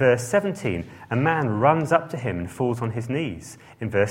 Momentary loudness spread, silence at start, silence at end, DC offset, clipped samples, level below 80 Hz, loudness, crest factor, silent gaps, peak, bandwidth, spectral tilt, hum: 12 LU; 0 s; 0 s; under 0.1%; under 0.1%; -54 dBFS; -24 LUFS; 20 dB; none; -4 dBFS; 16.5 kHz; -6.5 dB/octave; none